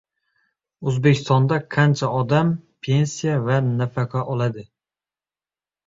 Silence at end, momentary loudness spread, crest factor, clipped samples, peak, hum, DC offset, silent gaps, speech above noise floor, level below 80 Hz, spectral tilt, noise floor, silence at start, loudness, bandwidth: 1.2 s; 7 LU; 18 dB; under 0.1%; -4 dBFS; none; under 0.1%; none; over 71 dB; -56 dBFS; -6.5 dB/octave; under -90 dBFS; 0.8 s; -21 LUFS; 7.8 kHz